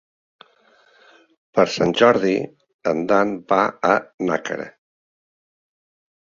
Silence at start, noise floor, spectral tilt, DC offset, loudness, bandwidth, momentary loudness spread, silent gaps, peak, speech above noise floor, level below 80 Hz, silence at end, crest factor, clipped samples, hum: 1.55 s; -57 dBFS; -5.5 dB/octave; under 0.1%; -20 LUFS; 7.6 kHz; 13 LU; 2.74-2.79 s, 4.14-4.18 s; -2 dBFS; 38 dB; -62 dBFS; 1.65 s; 20 dB; under 0.1%; none